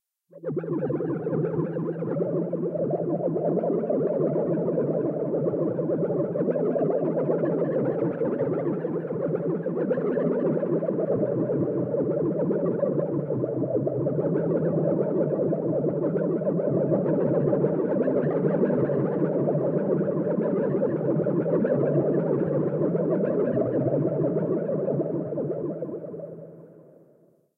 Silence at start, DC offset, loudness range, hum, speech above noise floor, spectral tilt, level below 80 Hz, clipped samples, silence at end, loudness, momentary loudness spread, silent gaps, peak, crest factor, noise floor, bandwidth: 0.35 s; under 0.1%; 2 LU; none; 34 dB; -13 dB/octave; -66 dBFS; under 0.1%; 0.85 s; -26 LUFS; 5 LU; none; -10 dBFS; 14 dB; -60 dBFS; 3.2 kHz